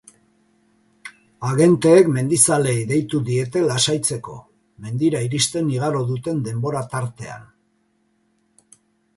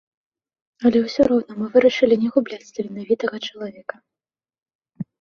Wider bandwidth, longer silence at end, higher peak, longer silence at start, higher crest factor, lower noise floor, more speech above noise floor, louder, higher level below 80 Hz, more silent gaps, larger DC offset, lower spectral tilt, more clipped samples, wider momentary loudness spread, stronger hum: first, 11.5 kHz vs 7.2 kHz; first, 1.75 s vs 0.15 s; about the same, 0 dBFS vs -2 dBFS; first, 1.05 s vs 0.8 s; about the same, 20 dB vs 18 dB; second, -65 dBFS vs under -90 dBFS; second, 46 dB vs over 70 dB; about the same, -19 LUFS vs -20 LUFS; about the same, -56 dBFS vs -58 dBFS; second, none vs 4.62-4.66 s, 4.75-4.79 s; neither; about the same, -5 dB/octave vs -6 dB/octave; neither; first, 22 LU vs 17 LU; neither